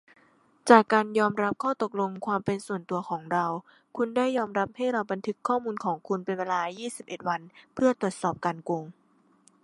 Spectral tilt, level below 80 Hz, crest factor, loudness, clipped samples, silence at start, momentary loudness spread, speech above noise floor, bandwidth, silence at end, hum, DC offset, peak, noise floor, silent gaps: -5.5 dB/octave; -72 dBFS; 26 dB; -28 LUFS; under 0.1%; 0.65 s; 10 LU; 35 dB; 11.5 kHz; 0.75 s; none; under 0.1%; -2 dBFS; -63 dBFS; none